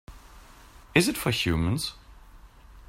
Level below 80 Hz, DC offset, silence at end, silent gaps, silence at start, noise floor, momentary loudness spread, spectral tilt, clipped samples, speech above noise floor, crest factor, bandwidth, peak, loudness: -46 dBFS; under 0.1%; 0.05 s; none; 0.1 s; -50 dBFS; 7 LU; -4.5 dB/octave; under 0.1%; 25 dB; 24 dB; 16 kHz; -6 dBFS; -26 LUFS